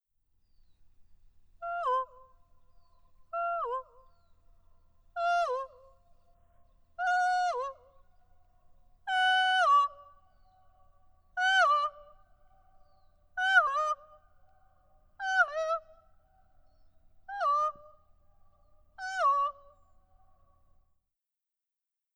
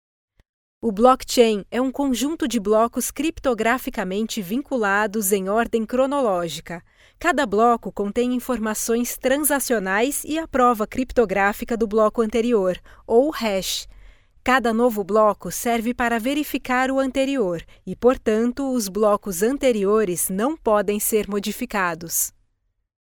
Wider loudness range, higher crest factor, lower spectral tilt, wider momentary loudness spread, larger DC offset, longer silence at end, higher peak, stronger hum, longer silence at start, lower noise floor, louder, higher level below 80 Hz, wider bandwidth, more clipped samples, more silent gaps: first, 8 LU vs 2 LU; about the same, 22 dB vs 18 dB; second, 1 dB/octave vs -3.5 dB/octave; first, 17 LU vs 7 LU; neither; first, 2.65 s vs 0.8 s; second, -12 dBFS vs -2 dBFS; neither; first, 1 s vs 0.85 s; first, -87 dBFS vs -71 dBFS; second, -29 LUFS vs -21 LUFS; second, -66 dBFS vs -46 dBFS; second, 11.5 kHz vs over 20 kHz; neither; neither